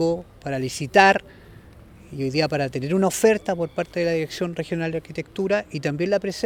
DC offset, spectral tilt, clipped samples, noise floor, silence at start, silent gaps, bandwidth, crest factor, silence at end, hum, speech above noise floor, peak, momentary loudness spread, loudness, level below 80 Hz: under 0.1%; -5 dB/octave; under 0.1%; -46 dBFS; 0 s; none; 19 kHz; 22 dB; 0 s; none; 24 dB; 0 dBFS; 12 LU; -23 LUFS; -52 dBFS